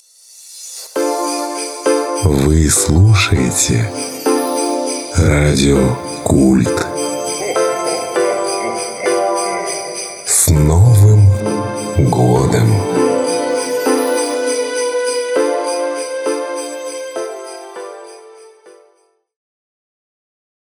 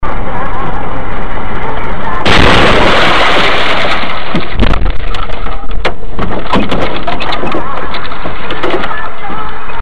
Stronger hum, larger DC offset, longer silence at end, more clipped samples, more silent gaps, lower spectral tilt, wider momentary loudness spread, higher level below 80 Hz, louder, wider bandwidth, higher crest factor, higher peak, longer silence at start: neither; second, under 0.1% vs 60%; first, 2.1 s vs 0 s; second, under 0.1% vs 0.7%; neither; about the same, -5 dB/octave vs -5 dB/octave; about the same, 13 LU vs 13 LU; second, -30 dBFS vs -20 dBFS; about the same, -15 LUFS vs -13 LUFS; first, 17.5 kHz vs 10.5 kHz; about the same, 14 dB vs 16 dB; about the same, 0 dBFS vs 0 dBFS; first, 0.4 s vs 0 s